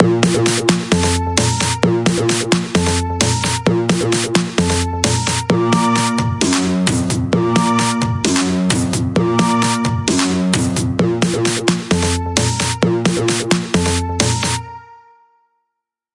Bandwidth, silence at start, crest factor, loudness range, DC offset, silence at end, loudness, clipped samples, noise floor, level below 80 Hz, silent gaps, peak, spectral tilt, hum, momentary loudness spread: 11.5 kHz; 0 s; 16 dB; 1 LU; under 0.1%; 1.2 s; -16 LUFS; under 0.1%; -78 dBFS; -42 dBFS; none; 0 dBFS; -4.5 dB/octave; none; 3 LU